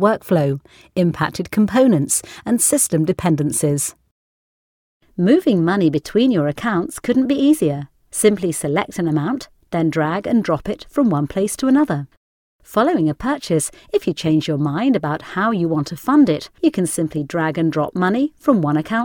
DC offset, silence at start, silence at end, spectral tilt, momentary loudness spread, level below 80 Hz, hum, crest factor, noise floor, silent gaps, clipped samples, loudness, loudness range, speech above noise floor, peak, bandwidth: under 0.1%; 0 s; 0 s; -5.5 dB/octave; 8 LU; -50 dBFS; none; 18 dB; under -90 dBFS; 4.11-5.00 s, 12.17-12.59 s; under 0.1%; -18 LUFS; 2 LU; over 72 dB; 0 dBFS; 19.5 kHz